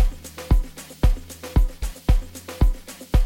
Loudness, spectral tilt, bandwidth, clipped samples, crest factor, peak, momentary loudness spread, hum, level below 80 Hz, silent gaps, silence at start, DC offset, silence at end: -25 LUFS; -6 dB/octave; 17 kHz; under 0.1%; 16 dB; -4 dBFS; 12 LU; none; -22 dBFS; none; 0 s; under 0.1%; 0 s